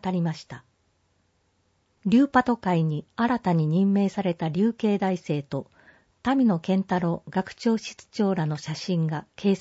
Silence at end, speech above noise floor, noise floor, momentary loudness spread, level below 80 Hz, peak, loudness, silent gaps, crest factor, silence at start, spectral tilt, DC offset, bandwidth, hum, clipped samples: 0 s; 45 dB; -69 dBFS; 10 LU; -62 dBFS; -6 dBFS; -25 LUFS; none; 18 dB; 0 s; -7.5 dB/octave; under 0.1%; 8 kHz; none; under 0.1%